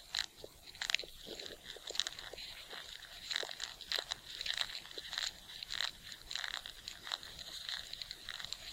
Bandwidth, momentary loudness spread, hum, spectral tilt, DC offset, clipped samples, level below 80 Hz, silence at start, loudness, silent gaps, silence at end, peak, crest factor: 17 kHz; 10 LU; none; 0.5 dB/octave; under 0.1%; under 0.1%; -64 dBFS; 0 s; -41 LUFS; none; 0 s; -10 dBFS; 34 dB